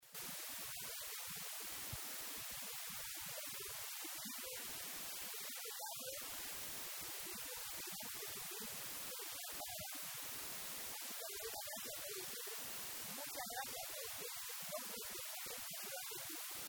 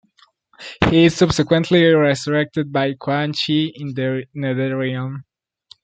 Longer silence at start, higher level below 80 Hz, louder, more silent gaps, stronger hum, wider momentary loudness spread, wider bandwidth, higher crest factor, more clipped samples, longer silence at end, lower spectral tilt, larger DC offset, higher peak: second, 0 s vs 0.6 s; second, -74 dBFS vs -46 dBFS; second, -45 LUFS vs -18 LUFS; neither; neither; second, 1 LU vs 11 LU; first, over 20 kHz vs 9.2 kHz; about the same, 16 dB vs 18 dB; neither; second, 0 s vs 0.6 s; second, -0.5 dB/octave vs -6 dB/octave; neither; second, -32 dBFS vs -2 dBFS